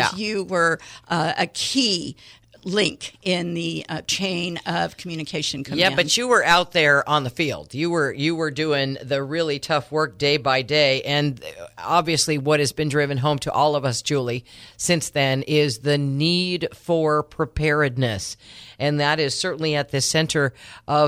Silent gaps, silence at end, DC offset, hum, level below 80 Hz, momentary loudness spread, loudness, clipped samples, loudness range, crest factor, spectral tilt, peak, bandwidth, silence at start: none; 0 s; under 0.1%; none; -52 dBFS; 9 LU; -21 LUFS; under 0.1%; 4 LU; 18 dB; -4 dB/octave; -4 dBFS; 15.5 kHz; 0 s